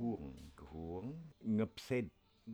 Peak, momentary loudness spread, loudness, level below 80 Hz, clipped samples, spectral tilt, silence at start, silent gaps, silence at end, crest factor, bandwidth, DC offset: -26 dBFS; 15 LU; -43 LUFS; -62 dBFS; under 0.1%; -7.5 dB/octave; 0 s; none; 0 s; 16 dB; 14 kHz; under 0.1%